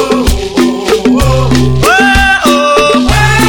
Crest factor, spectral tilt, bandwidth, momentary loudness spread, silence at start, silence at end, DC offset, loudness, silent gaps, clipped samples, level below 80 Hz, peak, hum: 8 dB; -5 dB/octave; 19.5 kHz; 5 LU; 0 s; 0 s; under 0.1%; -8 LUFS; none; 0.5%; -18 dBFS; 0 dBFS; none